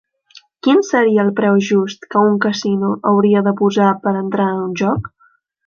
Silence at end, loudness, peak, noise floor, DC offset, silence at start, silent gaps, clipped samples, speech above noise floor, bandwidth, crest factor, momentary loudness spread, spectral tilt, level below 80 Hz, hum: 0.6 s; -15 LUFS; -2 dBFS; -56 dBFS; under 0.1%; 0.65 s; none; under 0.1%; 41 dB; 7.2 kHz; 14 dB; 6 LU; -6.5 dB/octave; -52 dBFS; none